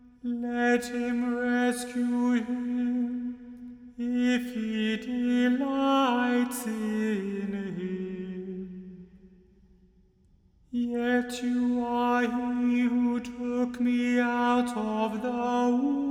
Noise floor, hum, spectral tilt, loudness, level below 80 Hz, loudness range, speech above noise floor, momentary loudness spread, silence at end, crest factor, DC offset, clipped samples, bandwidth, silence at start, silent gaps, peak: -62 dBFS; none; -5 dB/octave; -28 LUFS; -62 dBFS; 8 LU; 35 dB; 11 LU; 0 s; 14 dB; under 0.1%; under 0.1%; 14.5 kHz; 0.05 s; none; -14 dBFS